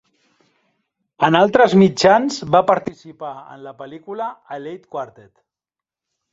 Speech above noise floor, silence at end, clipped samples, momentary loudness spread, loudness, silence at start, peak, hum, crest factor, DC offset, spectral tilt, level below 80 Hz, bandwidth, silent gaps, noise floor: 71 dB; 1.25 s; under 0.1%; 22 LU; -15 LUFS; 1.2 s; 0 dBFS; none; 18 dB; under 0.1%; -5.5 dB/octave; -58 dBFS; 8 kHz; none; -89 dBFS